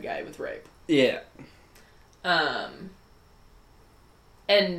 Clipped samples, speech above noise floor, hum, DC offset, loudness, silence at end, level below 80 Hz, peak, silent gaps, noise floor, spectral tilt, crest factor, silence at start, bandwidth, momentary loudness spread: under 0.1%; 30 dB; none; under 0.1%; -27 LUFS; 0 s; -60 dBFS; -8 dBFS; none; -56 dBFS; -5 dB/octave; 22 dB; 0 s; 15.5 kHz; 21 LU